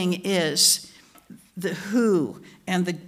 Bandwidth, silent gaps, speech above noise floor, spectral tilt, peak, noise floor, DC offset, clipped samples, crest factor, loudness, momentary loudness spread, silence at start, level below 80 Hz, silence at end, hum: 16.5 kHz; none; 25 dB; -3 dB/octave; -6 dBFS; -49 dBFS; under 0.1%; under 0.1%; 20 dB; -22 LUFS; 14 LU; 0 s; -70 dBFS; 0 s; none